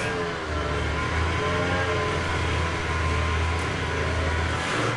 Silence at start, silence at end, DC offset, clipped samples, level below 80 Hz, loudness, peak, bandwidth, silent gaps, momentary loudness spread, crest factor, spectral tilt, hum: 0 s; 0 s; under 0.1%; under 0.1%; -36 dBFS; -26 LUFS; -12 dBFS; 11.5 kHz; none; 3 LU; 14 dB; -5 dB/octave; none